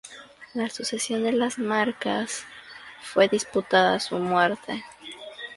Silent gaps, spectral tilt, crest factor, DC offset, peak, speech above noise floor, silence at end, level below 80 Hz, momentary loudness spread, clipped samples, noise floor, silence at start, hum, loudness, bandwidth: none; -3.5 dB/octave; 20 dB; under 0.1%; -6 dBFS; 21 dB; 0 s; -66 dBFS; 19 LU; under 0.1%; -46 dBFS; 0.05 s; none; -25 LUFS; 11.5 kHz